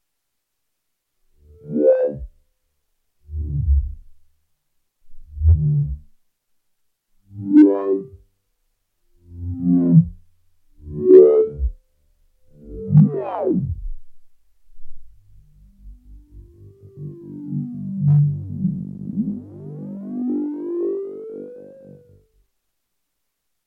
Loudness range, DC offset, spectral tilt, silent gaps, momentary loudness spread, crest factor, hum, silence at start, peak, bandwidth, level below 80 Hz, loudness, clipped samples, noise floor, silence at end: 12 LU; under 0.1%; -13 dB/octave; none; 22 LU; 20 dB; none; 1.65 s; 0 dBFS; 2.9 kHz; -32 dBFS; -18 LUFS; under 0.1%; -77 dBFS; 1.95 s